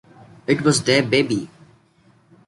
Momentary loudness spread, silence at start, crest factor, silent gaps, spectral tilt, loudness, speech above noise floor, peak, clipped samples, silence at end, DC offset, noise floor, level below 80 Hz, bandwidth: 14 LU; 0.5 s; 18 dB; none; -4.5 dB/octave; -19 LUFS; 38 dB; -2 dBFS; under 0.1%; 1 s; under 0.1%; -56 dBFS; -58 dBFS; 11.5 kHz